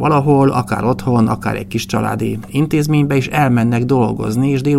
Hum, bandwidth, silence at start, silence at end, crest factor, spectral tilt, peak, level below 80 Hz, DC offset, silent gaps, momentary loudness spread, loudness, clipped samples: none; 15 kHz; 0 s; 0 s; 14 dB; -7 dB/octave; 0 dBFS; -42 dBFS; under 0.1%; none; 7 LU; -15 LUFS; under 0.1%